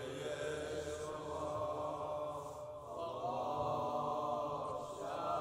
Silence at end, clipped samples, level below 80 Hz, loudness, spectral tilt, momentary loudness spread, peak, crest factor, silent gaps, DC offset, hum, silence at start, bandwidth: 0 s; under 0.1%; -66 dBFS; -41 LUFS; -5 dB/octave; 6 LU; -26 dBFS; 16 dB; none; under 0.1%; none; 0 s; 16 kHz